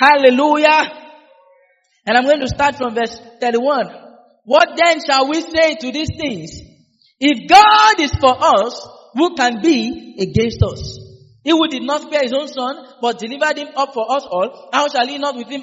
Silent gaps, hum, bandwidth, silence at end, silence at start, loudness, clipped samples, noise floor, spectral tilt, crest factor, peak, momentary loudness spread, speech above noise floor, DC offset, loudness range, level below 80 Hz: none; none; 8 kHz; 0 s; 0 s; -15 LUFS; under 0.1%; -57 dBFS; -2.5 dB/octave; 16 dB; 0 dBFS; 13 LU; 42 dB; under 0.1%; 6 LU; -42 dBFS